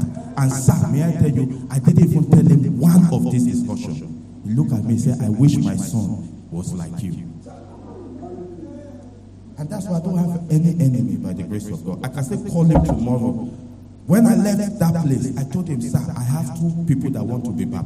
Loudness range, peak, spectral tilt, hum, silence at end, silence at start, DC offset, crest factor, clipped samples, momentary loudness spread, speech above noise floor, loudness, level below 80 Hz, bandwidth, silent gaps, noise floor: 12 LU; -4 dBFS; -8 dB/octave; none; 0 s; 0 s; under 0.1%; 16 dB; under 0.1%; 20 LU; 23 dB; -19 LUFS; -40 dBFS; 14.5 kHz; none; -40 dBFS